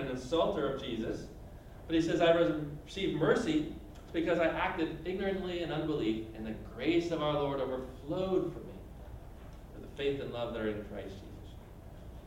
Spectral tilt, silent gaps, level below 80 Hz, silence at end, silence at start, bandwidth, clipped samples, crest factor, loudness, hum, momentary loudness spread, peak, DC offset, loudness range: -6 dB/octave; none; -52 dBFS; 0 s; 0 s; 16 kHz; under 0.1%; 20 dB; -34 LUFS; none; 20 LU; -14 dBFS; under 0.1%; 7 LU